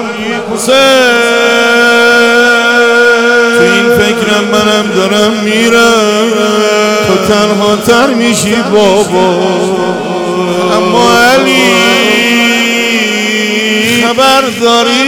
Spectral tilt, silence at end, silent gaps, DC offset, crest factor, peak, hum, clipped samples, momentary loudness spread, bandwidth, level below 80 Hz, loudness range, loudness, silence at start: -3 dB/octave; 0 s; none; under 0.1%; 8 dB; 0 dBFS; none; under 0.1%; 5 LU; 18.5 kHz; -44 dBFS; 3 LU; -7 LUFS; 0 s